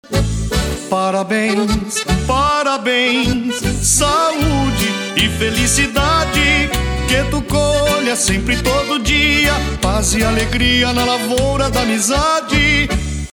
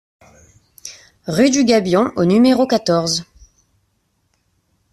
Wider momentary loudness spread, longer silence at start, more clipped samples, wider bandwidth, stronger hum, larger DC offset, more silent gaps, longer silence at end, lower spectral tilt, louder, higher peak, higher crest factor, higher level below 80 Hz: second, 5 LU vs 22 LU; second, 0.1 s vs 0.85 s; neither; first, 19.5 kHz vs 13.5 kHz; neither; neither; neither; second, 0.05 s vs 1.7 s; second, -3.5 dB/octave vs -5 dB/octave; about the same, -15 LUFS vs -15 LUFS; about the same, -2 dBFS vs 0 dBFS; about the same, 14 dB vs 18 dB; first, -24 dBFS vs -54 dBFS